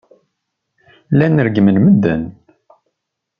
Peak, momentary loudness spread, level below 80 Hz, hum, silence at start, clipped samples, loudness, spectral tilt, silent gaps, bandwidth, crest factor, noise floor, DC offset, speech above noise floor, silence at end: -2 dBFS; 10 LU; -50 dBFS; none; 1.1 s; under 0.1%; -13 LUFS; -10.5 dB/octave; none; 5.2 kHz; 14 dB; -76 dBFS; under 0.1%; 64 dB; 1.1 s